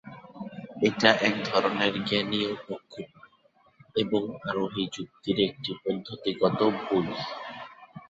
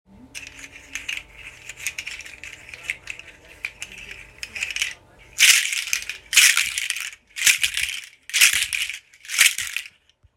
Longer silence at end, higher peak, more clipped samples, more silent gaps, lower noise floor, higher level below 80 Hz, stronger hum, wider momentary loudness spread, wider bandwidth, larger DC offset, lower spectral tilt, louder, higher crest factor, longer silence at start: second, 0.1 s vs 0.5 s; about the same, -2 dBFS vs 0 dBFS; neither; neither; first, -63 dBFS vs -52 dBFS; second, -64 dBFS vs -56 dBFS; neither; second, 18 LU vs 23 LU; second, 8 kHz vs 17 kHz; neither; first, -5 dB/octave vs 3.5 dB/octave; second, -27 LUFS vs -19 LUFS; about the same, 26 dB vs 24 dB; second, 0.05 s vs 0.35 s